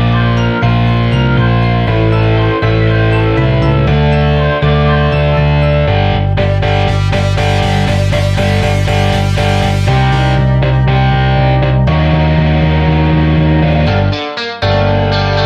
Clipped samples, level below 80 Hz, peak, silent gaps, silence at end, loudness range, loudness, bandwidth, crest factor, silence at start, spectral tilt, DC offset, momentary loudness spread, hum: under 0.1%; -20 dBFS; -2 dBFS; none; 0 s; 1 LU; -11 LUFS; 11 kHz; 10 dB; 0 s; -7 dB/octave; under 0.1%; 2 LU; none